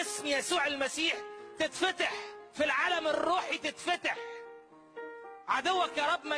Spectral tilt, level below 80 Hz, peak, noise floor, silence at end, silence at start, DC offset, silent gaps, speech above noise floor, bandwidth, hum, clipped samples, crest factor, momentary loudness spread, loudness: -1 dB/octave; -72 dBFS; -16 dBFS; -53 dBFS; 0 s; 0 s; under 0.1%; none; 21 dB; 11 kHz; none; under 0.1%; 16 dB; 17 LU; -31 LUFS